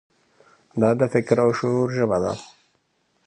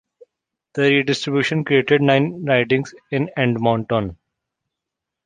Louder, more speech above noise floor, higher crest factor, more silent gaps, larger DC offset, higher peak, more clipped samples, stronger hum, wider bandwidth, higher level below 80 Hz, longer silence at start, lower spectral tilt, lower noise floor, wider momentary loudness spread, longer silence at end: about the same, -21 LUFS vs -19 LUFS; second, 48 dB vs 65 dB; about the same, 20 dB vs 18 dB; neither; neither; about the same, -4 dBFS vs -2 dBFS; neither; neither; about the same, 10 kHz vs 9.6 kHz; about the same, -56 dBFS vs -54 dBFS; about the same, 0.75 s vs 0.75 s; first, -7.5 dB/octave vs -6 dB/octave; second, -68 dBFS vs -83 dBFS; about the same, 10 LU vs 8 LU; second, 0.8 s vs 1.1 s